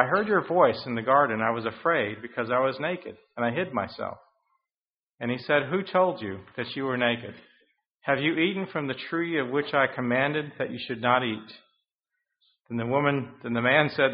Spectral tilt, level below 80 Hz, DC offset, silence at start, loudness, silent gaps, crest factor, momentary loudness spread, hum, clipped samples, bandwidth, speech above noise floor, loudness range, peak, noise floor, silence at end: -3.5 dB/octave; -68 dBFS; under 0.1%; 0 s; -26 LUFS; 4.81-4.86 s, 4.94-5.18 s, 7.91-7.95 s, 11.95-11.99 s; 24 dB; 12 LU; none; under 0.1%; 5.2 kHz; over 64 dB; 4 LU; -4 dBFS; under -90 dBFS; 0 s